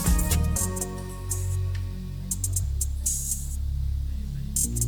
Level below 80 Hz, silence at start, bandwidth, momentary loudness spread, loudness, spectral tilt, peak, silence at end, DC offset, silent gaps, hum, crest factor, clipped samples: -30 dBFS; 0 s; 19.5 kHz; 9 LU; -28 LUFS; -4 dB/octave; -12 dBFS; 0 s; under 0.1%; none; none; 16 dB; under 0.1%